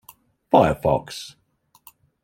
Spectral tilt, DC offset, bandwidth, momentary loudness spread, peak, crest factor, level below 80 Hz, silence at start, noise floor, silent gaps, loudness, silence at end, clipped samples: -6.5 dB/octave; under 0.1%; 17 kHz; 18 LU; -2 dBFS; 22 dB; -48 dBFS; 0.55 s; -55 dBFS; none; -20 LUFS; 0.95 s; under 0.1%